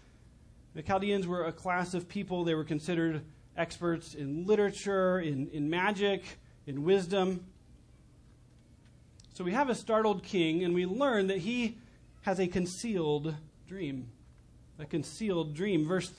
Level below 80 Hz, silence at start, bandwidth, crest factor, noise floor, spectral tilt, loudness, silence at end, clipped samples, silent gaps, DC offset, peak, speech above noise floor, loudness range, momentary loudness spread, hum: -60 dBFS; 0.75 s; 10.5 kHz; 18 dB; -59 dBFS; -6 dB/octave; -32 LUFS; 0.05 s; under 0.1%; none; under 0.1%; -16 dBFS; 28 dB; 5 LU; 12 LU; none